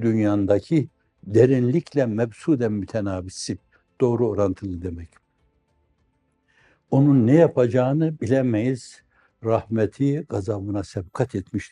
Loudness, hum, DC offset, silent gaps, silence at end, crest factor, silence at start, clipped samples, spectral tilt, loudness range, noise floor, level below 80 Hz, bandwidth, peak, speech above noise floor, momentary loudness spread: -22 LUFS; none; under 0.1%; none; 0.05 s; 18 dB; 0 s; under 0.1%; -8 dB/octave; 7 LU; -68 dBFS; -58 dBFS; 11 kHz; -4 dBFS; 47 dB; 14 LU